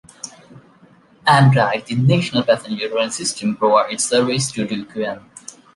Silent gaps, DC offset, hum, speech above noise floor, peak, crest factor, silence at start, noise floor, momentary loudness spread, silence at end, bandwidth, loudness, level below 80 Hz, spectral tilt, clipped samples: none; under 0.1%; none; 33 dB; -2 dBFS; 18 dB; 0.25 s; -50 dBFS; 20 LU; 0.55 s; 11.5 kHz; -18 LUFS; -58 dBFS; -5 dB/octave; under 0.1%